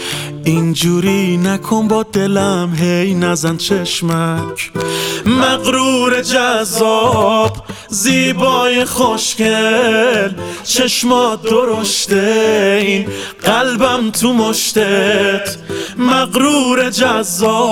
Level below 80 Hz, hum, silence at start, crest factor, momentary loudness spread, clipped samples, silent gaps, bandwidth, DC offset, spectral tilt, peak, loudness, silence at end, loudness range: -48 dBFS; none; 0 s; 14 dB; 6 LU; under 0.1%; none; 17.5 kHz; under 0.1%; -4 dB/octave; 0 dBFS; -13 LUFS; 0 s; 2 LU